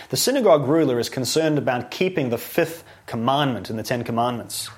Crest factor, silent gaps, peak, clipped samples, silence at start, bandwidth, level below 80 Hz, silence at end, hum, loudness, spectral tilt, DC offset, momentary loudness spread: 18 dB; none; -4 dBFS; under 0.1%; 0 s; 16.5 kHz; -60 dBFS; 0 s; none; -22 LUFS; -4.5 dB/octave; under 0.1%; 9 LU